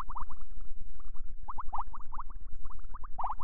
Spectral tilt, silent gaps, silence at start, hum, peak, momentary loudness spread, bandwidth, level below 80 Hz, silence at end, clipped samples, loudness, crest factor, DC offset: -9 dB/octave; none; 0 s; none; -16 dBFS; 12 LU; 1.9 kHz; -40 dBFS; 0 s; under 0.1%; -45 LUFS; 10 dB; 5%